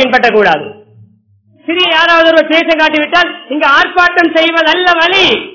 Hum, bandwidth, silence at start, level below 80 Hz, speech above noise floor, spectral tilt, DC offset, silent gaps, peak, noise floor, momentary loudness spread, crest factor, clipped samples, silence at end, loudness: none; 6 kHz; 0 s; -48 dBFS; 40 dB; -3.5 dB/octave; 0.4%; none; 0 dBFS; -49 dBFS; 7 LU; 10 dB; 2%; 0 s; -8 LUFS